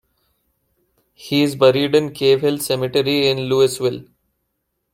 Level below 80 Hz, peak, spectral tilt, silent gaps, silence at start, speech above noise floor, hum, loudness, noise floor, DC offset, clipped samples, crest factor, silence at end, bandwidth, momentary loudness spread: -60 dBFS; -2 dBFS; -5 dB/octave; none; 1.2 s; 56 dB; none; -17 LUFS; -73 dBFS; under 0.1%; under 0.1%; 18 dB; 0.9 s; 16.5 kHz; 7 LU